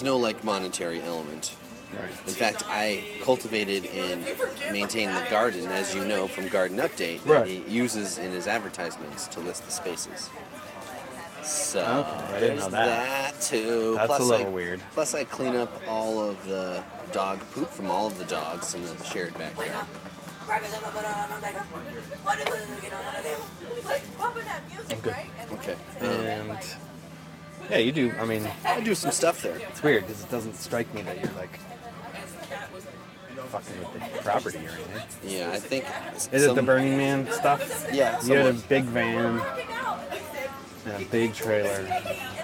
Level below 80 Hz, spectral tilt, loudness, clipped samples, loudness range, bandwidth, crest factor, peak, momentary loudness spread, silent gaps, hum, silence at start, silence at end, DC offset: -62 dBFS; -4 dB/octave; -28 LUFS; under 0.1%; 8 LU; 17 kHz; 22 dB; -6 dBFS; 14 LU; none; none; 0 s; 0 s; under 0.1%